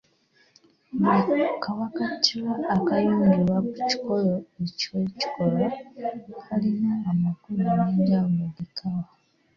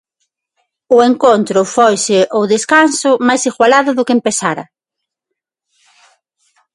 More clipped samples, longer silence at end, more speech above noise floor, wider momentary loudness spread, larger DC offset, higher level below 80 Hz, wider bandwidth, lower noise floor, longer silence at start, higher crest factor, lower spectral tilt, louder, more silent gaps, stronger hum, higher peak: neither; second, 0.5 s vs 2.1 s; second, 39 dB vs 68 dB; first, 12 LU vs 5 LU; neither; about the same, -60 dBFS vs -60 dBFS; second, 7.2 kHz vs 11.5 kHz; second, -63 dBFS vs -79 dBFS; about the same, 0.95 s vs 0.9 s; first, 20 dB vs 14 dB; first, -6.5 dB/octave vs -3.5 dB/octave; second, -25 LUFS vs -11 LUFS; neither; neither; second, -6 dBFS vs 0 dBFS